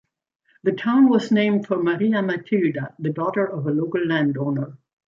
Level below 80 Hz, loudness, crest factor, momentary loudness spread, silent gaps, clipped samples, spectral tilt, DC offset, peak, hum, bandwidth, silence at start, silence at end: -68 dBFS; -21 LUFS; 14 dB; 10 LU; none; under 0.1%; -8 dB/octave; under 0.1%; -6 dBFS; none; 7.4 kHz; 0.65 s; 0.35 s